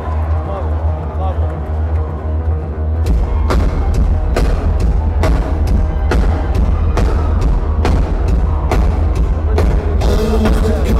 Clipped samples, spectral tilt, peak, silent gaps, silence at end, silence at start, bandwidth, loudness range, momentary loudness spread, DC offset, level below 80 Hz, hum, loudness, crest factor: under 0.1%; -7.5 dB/octave; -2 dBFS; none; 0 s; 0 s; 11.5 kHz; 2 LU; 4 LU; under 0.1%; -14 dBFS; none; -16 LUFS; 12 dB